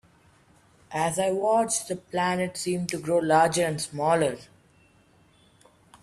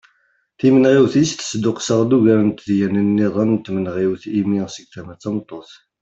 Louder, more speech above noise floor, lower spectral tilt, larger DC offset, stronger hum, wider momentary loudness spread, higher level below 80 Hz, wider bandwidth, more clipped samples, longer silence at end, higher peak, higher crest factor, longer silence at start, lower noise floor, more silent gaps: second, -25 LUFS vs -17 LUFS; second, 35 dB vs 46 dB; second, -4 dB/octave vs -6 dB/octave; neither; neither; second, 8 LU vs 16 LU; second, -64 dBFS vs -56 dBFS; first, 14.5 kHz vs 8 kHz; neither; first, 1.6 s vs 0.4 s; second, -8 dBFS vs -2 dBFS; about the same, 18 dB vs 14 dB; first, 0.9 s vs 0.65 s; about the same, -60 dBFS vs -63 dBFS; neither